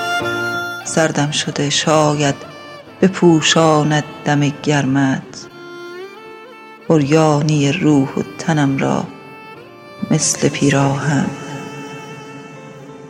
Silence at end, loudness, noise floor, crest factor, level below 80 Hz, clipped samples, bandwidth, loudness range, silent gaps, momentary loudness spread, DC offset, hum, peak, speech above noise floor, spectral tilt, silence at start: 0 s; -15 LUFS; -37 dBFS; 16 dB; -54 dBFS; under 0.1%; 15 kHz; 4 LU; none; 23 LU; under 0.1%; none; 0 dBFS; 23 dB; -5 dB/octave; 0 s